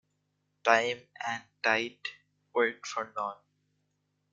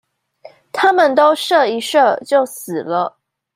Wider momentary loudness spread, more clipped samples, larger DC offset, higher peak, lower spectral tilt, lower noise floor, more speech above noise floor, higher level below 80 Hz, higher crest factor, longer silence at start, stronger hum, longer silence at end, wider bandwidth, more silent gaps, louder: about the same, 12 LU vs 11 LU; neither; neither; second, -6 dBFS vs -2 dBFS; about the same, -2.5 dB/octave vs -3.5 dB/octave; first, -78 dBFS vs -44 dBFS; first, 47 dB vs 29 dB; second, -80 dBFS vs -70 dBFS; first, 26 dB vs 14 dB; about the same, 0.65 s vs 0.75 s; first, 50 Hz at -80 dBFS vs none; first, 1 s vs 0.45 s; second, 7.8 kHz vs 16 kHz; neither; second, -31 LUFS vs -15 LUFS